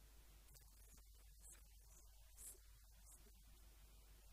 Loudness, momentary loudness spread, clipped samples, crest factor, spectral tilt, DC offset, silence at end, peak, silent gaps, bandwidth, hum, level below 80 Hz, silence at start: -65 LUFS; 9 LU; under 0.1%; 22 dB; -2.5 dB/octave; under 0.1%; 0 s; -44 dBFS; none; 15.5 kHz; none; -66 dBFS; 0 s